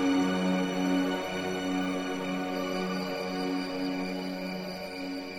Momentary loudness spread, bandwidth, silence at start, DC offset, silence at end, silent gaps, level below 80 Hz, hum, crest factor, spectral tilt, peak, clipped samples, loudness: 8 LU; 17.5 kHz; 0 s; under 0.1%; 0 s; none; -62 dBFS; none; 14 dB; -5.5 dB/octave; -18 dBFS; under 0.1%; -31 LUFS